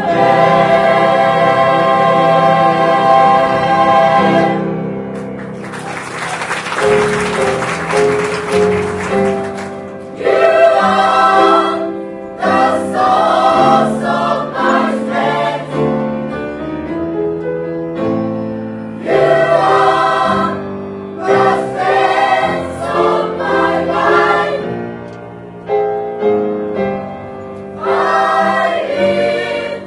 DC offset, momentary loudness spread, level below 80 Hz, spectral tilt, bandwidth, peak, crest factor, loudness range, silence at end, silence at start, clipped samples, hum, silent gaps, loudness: under 0.1%; 14 LU; -48 dBFS; -5.5 dB/octave; 11.5 kHz; 0 dBFS; 14 dB; 7 LU; 0 s; 0 s; under 0.1%; none; none; -13 LUFS